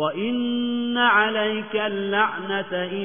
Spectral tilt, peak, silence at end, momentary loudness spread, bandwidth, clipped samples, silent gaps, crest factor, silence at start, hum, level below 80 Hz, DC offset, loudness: -8.5 dB/octave; -6 dBFS; 0 s; 8 LU; 3.6 kHz; under 0.1%; none; 16 dB; 0 s; none; -70 dBFS; 0.3%; -22 LUFS